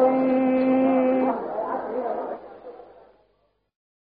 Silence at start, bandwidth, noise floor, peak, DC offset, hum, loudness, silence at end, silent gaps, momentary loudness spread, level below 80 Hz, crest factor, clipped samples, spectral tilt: 0 s; 4.5 kHz; -68 dBFS; -8 dBFS; under 0.1%; 50 Hz at -70 dBFS; -23 LUFS; 1.2 s; none; 20 LU; -64 dBFS; 16 dB; under 0.1%; -6 dB/octave